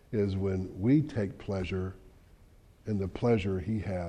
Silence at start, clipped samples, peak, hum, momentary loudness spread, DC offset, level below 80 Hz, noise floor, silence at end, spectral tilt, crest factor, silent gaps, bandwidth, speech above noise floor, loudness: 0.1 s; under 0.1%; -16 dBFS; none; 9 LU; under 0.1%; -52 dBFS; -58 dBFS; 0 s; -8.5 dB/octave; 16 dB; none; 9.4 kHz; 28 dB; -31 LUFS